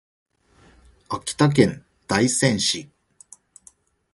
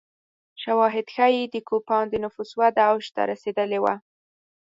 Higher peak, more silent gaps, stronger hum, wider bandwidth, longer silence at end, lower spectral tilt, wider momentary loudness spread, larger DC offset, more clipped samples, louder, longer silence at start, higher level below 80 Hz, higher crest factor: first, 0 dBFS vs -6 dBFS; neither; neither; first, 11.5 kHz vs 7.8 kHz; first, 1.3 s vs 0.7 s; about the same, -4.5 dB/octave vs -5.5 dB/octave; first, 13 LU vs 8 LU; neither; neither; about the same, -21 LUFS vs -23 LUFS; first, 1.1 s vs 0.6 s; first, -54 dBFS vs -66 dBFS; first, 24 dB vs 18 dB